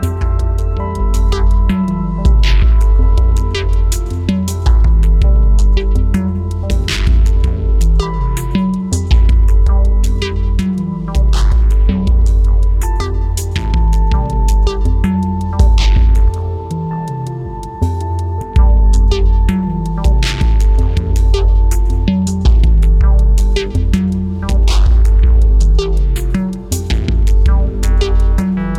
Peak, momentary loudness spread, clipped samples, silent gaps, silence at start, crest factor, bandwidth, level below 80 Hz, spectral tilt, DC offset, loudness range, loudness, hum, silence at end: 0 dBFS; 7 LU; under 0.1%; none; 0 s; 10 dB; 11 kHz; -12 dBFS; -6.5 dB/octave; under 0.1%; 2 LU; -14 LUFS; none; 0 s